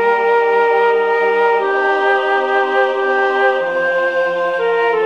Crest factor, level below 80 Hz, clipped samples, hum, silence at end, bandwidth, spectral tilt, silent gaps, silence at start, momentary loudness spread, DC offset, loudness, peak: 12 dB; -72 dBFS; under 0.1%; none; 0 s; 7.4 kHz; -4 dB/octave; none; 0 s; 3 LU; 0.2%; -14 LUFS; -4 dBFS